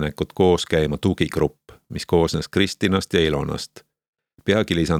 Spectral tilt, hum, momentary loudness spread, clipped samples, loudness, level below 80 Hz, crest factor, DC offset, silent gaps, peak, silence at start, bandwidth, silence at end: -5.5 dB/octave; none; 11 LU; under 0.1%; -21 LUFS; -40 dBFS; 18 dB; under 0.1%; 4.08-4.13 s; -2 dBFS; 0 s; 16 kHz; 0 s